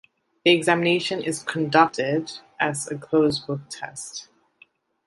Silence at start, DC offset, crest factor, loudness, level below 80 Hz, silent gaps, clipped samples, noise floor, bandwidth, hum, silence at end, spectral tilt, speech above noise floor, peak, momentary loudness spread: 0.45 s; under 0.1%; 22 dB; -22 LUFS; -64 dBFS; none; under 0.1%; -58 dBFS; 11.5 kHz; none; 0.85 s; -4 dB/octave; 35 dB; -2 dBFS; 16 LU